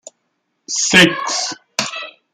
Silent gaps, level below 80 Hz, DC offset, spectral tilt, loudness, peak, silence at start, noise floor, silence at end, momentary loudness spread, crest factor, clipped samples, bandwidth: none; -56 dBFS; under 0.1%; -2 dB/octave; -15 LUFS; 0 dBFS; 0.7 s; -70 dBFS; 0.25 s; 14 LU; 18 dB; under 0.1%; 16 kHz